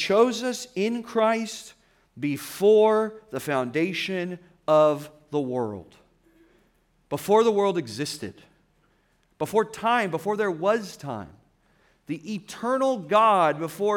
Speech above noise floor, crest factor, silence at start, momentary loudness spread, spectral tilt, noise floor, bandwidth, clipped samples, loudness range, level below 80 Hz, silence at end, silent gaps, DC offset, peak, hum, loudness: 42 dB; 18 dB; 0 s; 15 LU; -5 dB/octave; -66 dBFS; 18 kHz; under 0.1%; 4 LU; -68 dBFS; 0 s; none; under 0.1%; -8 dBFS; none; -24 LUFS